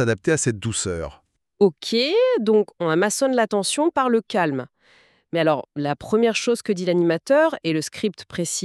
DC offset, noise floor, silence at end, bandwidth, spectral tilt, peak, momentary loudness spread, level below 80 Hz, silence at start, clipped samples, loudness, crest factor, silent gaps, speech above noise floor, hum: under 0.1%; -57 dBFS; 0 s; 13.5 kHz; -4.5 dB/octave; -4 dBFS; 9 LU; -54 dBFS; 0 s; under 0.1%; -21 LUFS; 16 dB; none; 36 dB; none